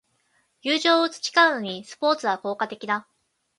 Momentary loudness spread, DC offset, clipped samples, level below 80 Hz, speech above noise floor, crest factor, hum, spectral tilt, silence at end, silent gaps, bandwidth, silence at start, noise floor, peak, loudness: 11 LU; under 0.1%; under 0.1%; -78 dBFS; 45 dB; 20 dB; none; -2.5 dB/octave; 0.55 s; none; 11.5 kHz; 0.65 s; -68 dBFS; -6 dBFS; -23 LUFS